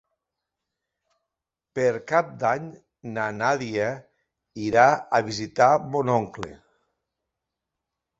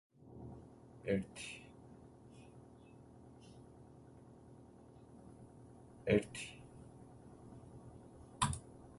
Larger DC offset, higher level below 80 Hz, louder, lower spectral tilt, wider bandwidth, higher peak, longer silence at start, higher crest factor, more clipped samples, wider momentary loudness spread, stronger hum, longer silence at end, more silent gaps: neither; about the same, -62 dBFS vs -62 dBFS; first, -23 LUFS vs -41 LUFS; about the same, -5.5 dB/octave vs -5 dB/octave; second, 8 kHz vs 11.5 kHz; first, -2 dBFS vs -18 dBFS; first, 1.75 s vs 0.15 s; about the same, 24 dB vs 28 dB; neither; about the same, 19 LU vs 21 LU; neither; first, 1.65 s vs 0 s; neither